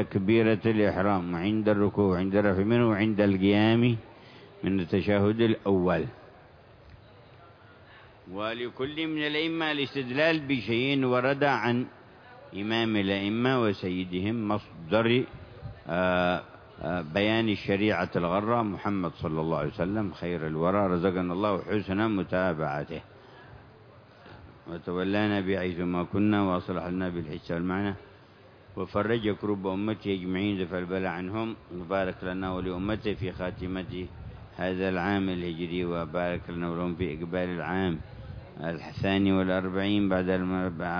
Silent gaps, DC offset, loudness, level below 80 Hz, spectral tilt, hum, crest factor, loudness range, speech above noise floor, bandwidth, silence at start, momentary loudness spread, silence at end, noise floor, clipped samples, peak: none; under 0.1%; -28 LUFS; -54 dBFS; -8.5 dB/octave; none; 20 dB; 7 LU; 26 dB; 5.4 kHz; 0 s; 10 LU; 0 s; -54 dBFS; under 0.1%; -10 dBFS